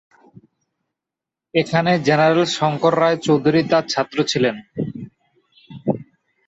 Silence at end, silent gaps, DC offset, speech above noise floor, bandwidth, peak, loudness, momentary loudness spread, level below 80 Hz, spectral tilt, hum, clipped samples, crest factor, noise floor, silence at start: 0.45 s; none; under 0.1%; 69 dB; 8.2 kHz; -2 dBFS; -19 LUFS; 13 LU; -60 dBFS; -5.5 dB/octave; none; under 0.1%; 18 dB; -86 dBFS; 1.55 s